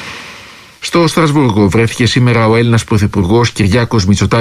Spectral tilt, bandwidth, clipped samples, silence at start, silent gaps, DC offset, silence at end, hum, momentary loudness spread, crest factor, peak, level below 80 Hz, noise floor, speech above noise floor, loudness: -6 dB/octave; 14 kHz; under 0.1%; 0 s; none; under 0.1%; 0 s; none; 7 LU; 10 dB; 0 dBFS; -30 dBFS; -35 dBFS; 25 dB; -11 LUFS